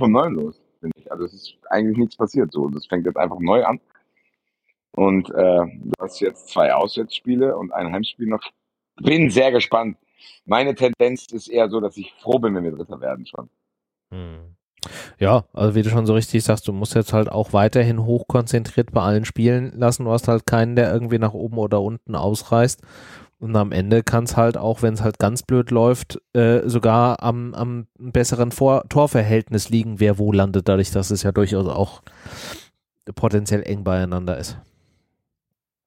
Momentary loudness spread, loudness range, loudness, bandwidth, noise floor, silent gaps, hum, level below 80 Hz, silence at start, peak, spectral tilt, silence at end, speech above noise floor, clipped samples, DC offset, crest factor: 14 LU; 5 LU; -20 LUFS; 16 kHz; -84 dBFS; 14.63-14.71 s; none; -46 dBFS; 0 s; -2 dBFS; -6.5 dB/octave; 1.25 s; 65 dB; under 0.1%; under 0.1%; 18 dB